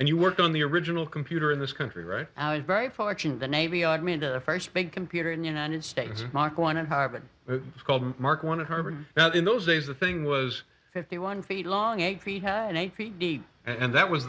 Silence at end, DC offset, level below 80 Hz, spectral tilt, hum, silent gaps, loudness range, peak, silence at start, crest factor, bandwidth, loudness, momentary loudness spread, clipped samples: 0 s; under 0.1%; -62 dBFS; -6 dB/octave; none; none; 3 LU; -8 dBFS; 0 s; 20 dB; 8 kHz; -28 LUFS; 11 LU; under 0.1%